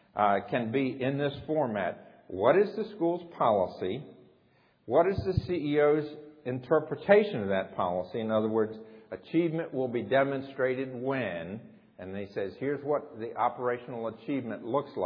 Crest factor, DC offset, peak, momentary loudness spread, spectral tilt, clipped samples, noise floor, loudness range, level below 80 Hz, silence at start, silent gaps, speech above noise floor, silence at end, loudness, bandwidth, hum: 20 dB; under 0.1%; -10 dBFS; 13 LU; -9.5 dB/octave; under 0.1%; -65 dBFS; 6 LU; -58 dBFS; 0.15 s; none; 36 dB; 0 s; -30 LUFS; 5.2 kHz; none